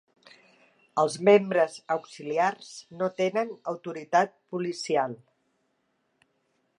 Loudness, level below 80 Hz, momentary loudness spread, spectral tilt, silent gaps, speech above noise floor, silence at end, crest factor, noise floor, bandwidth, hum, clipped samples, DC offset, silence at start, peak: -27 LUFS; -82 dBFS; 14 LU; -5 dB/octave; none; 48 dB; 1.65 s; 20 dB; -74 dBFS; 11 kHz; none; under 0.1%; under 0.1%; 0.95 s; -8 dBFS